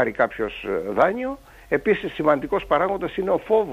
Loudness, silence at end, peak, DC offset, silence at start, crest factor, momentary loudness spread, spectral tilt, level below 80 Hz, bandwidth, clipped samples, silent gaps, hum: -23 LUFS; 0 s; -4 dBFS; under 0.1%; 0 s; 18 dB; 8 LU; -7 dB/octave; -48 dBFS; 15 kHz; under 0.1%; none; none